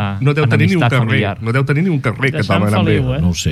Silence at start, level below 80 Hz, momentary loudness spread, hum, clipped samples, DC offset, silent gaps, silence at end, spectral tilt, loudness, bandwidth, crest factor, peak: 0 s; -36 dBFS; 4 LU; none; under 0.1%; under 0.1%; none; 0 s; -6.5 dB/octave; -15 LUFS; 13 kHz; 12 dB; -2 dBFS